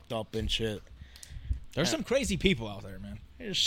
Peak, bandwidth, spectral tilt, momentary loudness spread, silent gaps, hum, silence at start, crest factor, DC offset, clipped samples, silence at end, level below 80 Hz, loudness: -8 dBFS; 16.5 kHz; -4 dB/octave; 18 LU; none; none; 0 s; 24 dB; under 0.1%; under 0.1%; 0 s; -44 dBFS; -31 LUFS